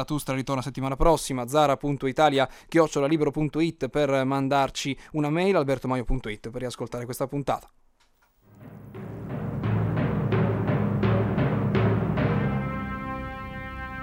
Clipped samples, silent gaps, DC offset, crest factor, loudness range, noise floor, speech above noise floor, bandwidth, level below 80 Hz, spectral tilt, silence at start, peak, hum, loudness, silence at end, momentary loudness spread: under 0.1%; none; under 0.1%; 20 dB; 8 LU; -64 dBFS; 39 dB; 16 kHz; -40 dBFS; -6.5 dB/octave; 0 s; -6 dBFS; none; -26 LUFS; 0 s; 11 LU